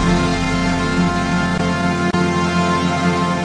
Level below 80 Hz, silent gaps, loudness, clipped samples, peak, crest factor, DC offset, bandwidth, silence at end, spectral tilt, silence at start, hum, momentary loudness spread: -32 dBFS; none; -17 LUFS; under 0.1%; -4 dBFS; 12 dB; under 0.1%; 10.5 kHz; 0 s; -5.5 dB/octave; 0 s; none; 1 LU